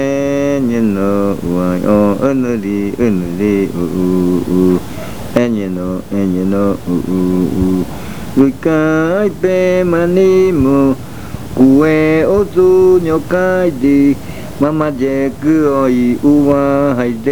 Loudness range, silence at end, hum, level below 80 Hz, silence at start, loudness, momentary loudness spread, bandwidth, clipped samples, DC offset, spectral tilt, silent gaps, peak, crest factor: 4 LU; 0 s; none; -36 dBFS; 0 s; -13 LUFS; 8 LU; over 20 kHz; under 0.1%; 3%; -7.5 dB/octave; none; 0 dBFS; 12 dB